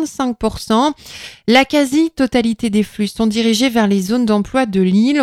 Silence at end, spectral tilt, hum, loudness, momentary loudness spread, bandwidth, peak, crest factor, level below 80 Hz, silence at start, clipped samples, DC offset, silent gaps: 0 s; -5 dB/octave; none; -15 LUFS; 7 LU; 15 kHz; 0 dBFS; 14 dB; -42 dBFS; 0 s; under 0.1%; under 0.1%; none